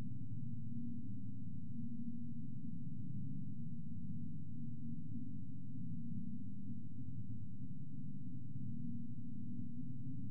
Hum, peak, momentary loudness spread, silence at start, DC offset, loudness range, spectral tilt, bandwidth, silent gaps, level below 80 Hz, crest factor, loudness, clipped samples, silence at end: none; -30 dBFS; 3 LU; 0 s; 1%; 1 LU; -19.5 dB/octave; 0.6 kHz; none; -74 dBFS; 12 dB; -49 LUFS; under 0.1%; 0 s